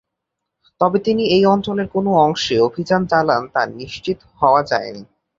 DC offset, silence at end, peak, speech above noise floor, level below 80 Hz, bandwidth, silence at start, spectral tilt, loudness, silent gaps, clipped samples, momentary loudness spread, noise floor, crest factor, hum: under 0.1%; 0.35 s; 0 dBFS; 62 dB; -52 dBFS; 7.6 kHz; 0.8 s; -5.5 dB/octave; -17 LUFS; none; under 0.1%; 11 LU; -79 dBFS; 18 dB; none